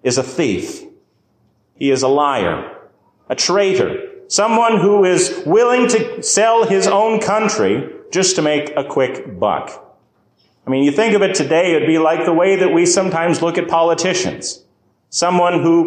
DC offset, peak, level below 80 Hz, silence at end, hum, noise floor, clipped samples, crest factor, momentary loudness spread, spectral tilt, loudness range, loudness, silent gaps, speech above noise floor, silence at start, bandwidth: under 0.1%; -4 dBFS; -54 dBFS; 0 s; none; -59 dBFS; under 0.1%; 12 dB; 10 LU; -4 dB/octave; 5 LU; -15 LUFS; none; 45 dB; 0.05 s; 10.5 kHz